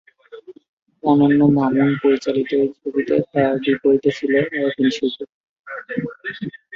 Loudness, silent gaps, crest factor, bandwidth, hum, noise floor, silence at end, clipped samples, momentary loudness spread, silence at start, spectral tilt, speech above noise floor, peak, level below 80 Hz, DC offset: -18 LUFS; 0.69-0.86 s, 5.29-5.64 s; 18 dB; 7.2 kHz; none; -41 dBFS; 0 s; under 0.1%; 14 LU; 0.3 s; -7.5 dB/octave; 23 dB; -2 dBFS; -58 dBFS; under 0.1%